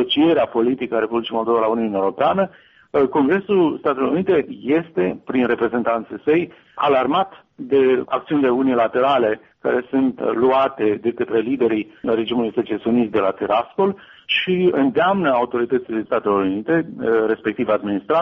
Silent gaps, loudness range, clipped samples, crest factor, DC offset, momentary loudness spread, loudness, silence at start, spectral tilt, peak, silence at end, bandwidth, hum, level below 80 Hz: none; 2 LU; under 0.1%; 12 dB; under 0.1%; 5 LU; -19 LUFS; 0 s; -4 dB/octave; -6 dBFS; 0 s; 5.6 kHz; none; -58 dBFS